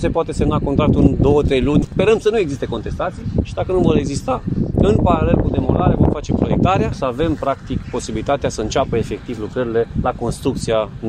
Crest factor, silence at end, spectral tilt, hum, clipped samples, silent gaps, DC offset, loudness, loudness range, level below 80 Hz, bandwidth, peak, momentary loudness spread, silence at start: 16 dB; 0 s; -7 dB/octave; none; under 0.1%; none; under 0.1%; -18 LUFS; 4 LU; -28 dBFS; 12.5 kHz; 0 dBFS; 9 LU; 0 s